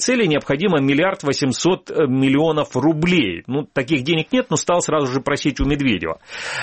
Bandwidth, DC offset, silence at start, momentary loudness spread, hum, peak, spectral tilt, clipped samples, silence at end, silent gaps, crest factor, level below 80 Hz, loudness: 8.8 kHz; under 0.1%; 0 s; 6 LU; none; -6 dBFS; -5 dB/octave; under 0.1%; 0 s; none; 14 dB; -38 dBFS; -19 LUFS